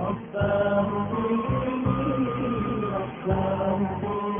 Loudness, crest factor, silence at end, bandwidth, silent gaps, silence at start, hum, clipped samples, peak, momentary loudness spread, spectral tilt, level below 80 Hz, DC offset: -26 LUFS; 14 dB; 0 s; 3.7 kHz; none; 0 s; none; under 0.1%; -10 dBFS; 4 LU; -12 dB/octave; -44 dBFS; under 0.1%